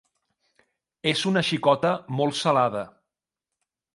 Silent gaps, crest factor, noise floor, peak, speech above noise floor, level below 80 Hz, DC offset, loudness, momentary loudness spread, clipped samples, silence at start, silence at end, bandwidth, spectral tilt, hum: none; 20 dB; -87 dBFS; -6 dBFS; 64 dB; -68 dBFS; under 0.1%; -24 LUFS; 7 LU; under 0.1%; 1.05 s; 1.05 s; 11.5 kHz; -5 dB/octave; none